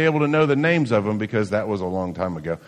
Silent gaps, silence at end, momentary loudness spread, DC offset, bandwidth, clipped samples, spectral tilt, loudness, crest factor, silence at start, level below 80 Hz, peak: none; 0.1 s; 8 LU; under 0.1%; 10.5 kHz; under 0.1%; -7.5 dB/octave; -21 LUFS; 16 dB; 0 s; -56 dBFS; -6 dBFS